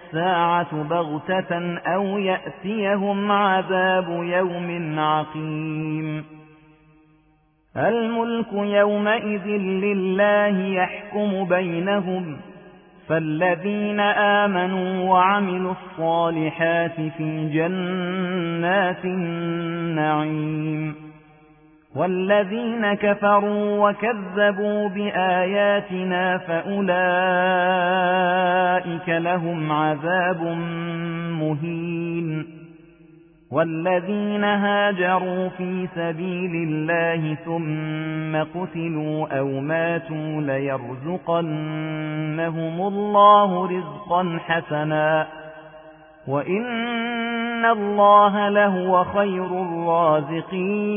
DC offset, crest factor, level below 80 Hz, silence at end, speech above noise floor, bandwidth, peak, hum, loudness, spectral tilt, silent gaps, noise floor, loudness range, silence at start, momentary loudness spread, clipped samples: under 0.1%; 18 dB; -62 dBFS; 0 s; 39 dB; 3.6 kHz; -2 dBFS; none; -22 LUFS; -10.5 dB/octave; none; -61 dBFS; 6 LU; 0 s; 9 LU; under 0.1%